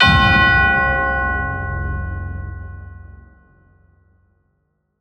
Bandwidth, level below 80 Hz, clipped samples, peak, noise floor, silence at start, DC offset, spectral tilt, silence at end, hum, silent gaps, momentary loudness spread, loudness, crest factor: 9.6 kHz; -28 dBFS; under 0.1%; 0 dBFS; -68 dBFS; 0 s; under 0.1%; -6 dB/octave; 1.8 s; none; none; 22 LU; -16 LUFS; 18 dB